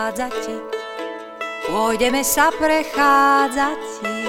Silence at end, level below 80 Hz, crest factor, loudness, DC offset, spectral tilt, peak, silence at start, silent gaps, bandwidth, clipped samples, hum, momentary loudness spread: 0 s; -46 dBFS; 16 dB; -18 LUFS; under 0.1%; -2 dB/octave; -2 dBFS; 0 s; none; 16.5 kHz; under 0.1%; none; 15 LU